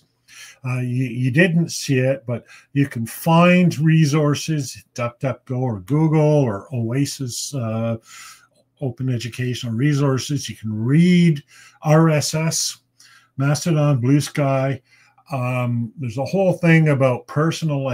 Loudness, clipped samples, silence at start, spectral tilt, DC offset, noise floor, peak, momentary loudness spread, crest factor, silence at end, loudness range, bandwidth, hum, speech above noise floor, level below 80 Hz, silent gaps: -19 LUFS; under 0.1%; 0.35 s; -6 dB/octave; under 0.1%; -52 dBFS; 0 dBFS; 12 LU; 18 dB; 0 s; 5 LU; 16 kHz; none; 33 dB; -60 dBFS; none